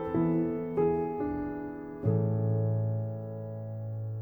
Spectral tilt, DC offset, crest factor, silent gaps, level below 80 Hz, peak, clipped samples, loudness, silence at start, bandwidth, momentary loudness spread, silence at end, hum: -12.5 dB/octave; under 0.1%; 16 dB; none; -56 dBFS; -16 dBFS; under 0.1%; -32 LUFS; 0 s; 3.1 kHz; 10 LU; 0 s; none